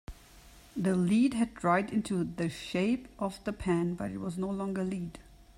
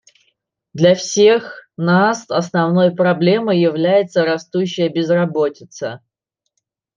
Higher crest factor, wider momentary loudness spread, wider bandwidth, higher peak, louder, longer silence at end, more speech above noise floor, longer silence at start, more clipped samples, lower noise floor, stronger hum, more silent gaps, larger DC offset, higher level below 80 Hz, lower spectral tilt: about the same, 18 dB vs 14 dB; second, 10 LU vs 13 LU; first, 14 kHz vs 7.6 kHz; second, -14 dBFS vs -2 dBFS; second, -31 LUFS vs -16 LUFS; second, 0.15 s vs 1 s; second, 24 dB vs 61 dB; second, 0.1 s vs 0.75 s; neither; second, -55 dBFS vs -77 dBFS; neither; neither; neither; first, -54 dBFS vs -64 dBFS; about the same, -6.5 dB/octave vs -5.5 dB/octave